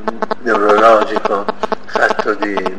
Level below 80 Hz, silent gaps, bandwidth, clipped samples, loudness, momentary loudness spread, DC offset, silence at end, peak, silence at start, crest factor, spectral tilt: -50 dBFS; none; 11.5 kHz; under 0.1%; -14 LUFS; 11 LU; 6%; 0 s; 0 dBFS; 0 s; 14 dB; -4.5 dB/octave